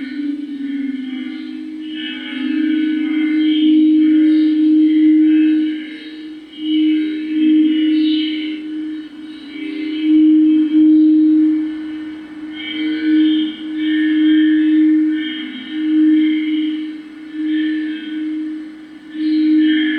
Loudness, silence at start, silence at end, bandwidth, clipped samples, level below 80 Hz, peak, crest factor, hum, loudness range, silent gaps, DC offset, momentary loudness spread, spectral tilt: -15 LUFS; 0 s; 0 s; 4.6 kHz; under 0.1%; -64 dBFS; -4 dBFS; 10 dB; none; 6 LU; none; under 0.1%; 17 LU; -5.5 dB/octave